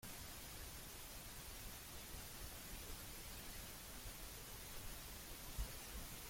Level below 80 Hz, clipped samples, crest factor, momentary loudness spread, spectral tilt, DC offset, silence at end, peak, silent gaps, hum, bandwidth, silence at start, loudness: -56 dBFS; under 0.1%; 18 dB; 3 LU; -2.5 dB/octave; under 0.1%; 0 s; -34 dBFS; none; none; 16.5 kHz; 0 s; -52 LUFS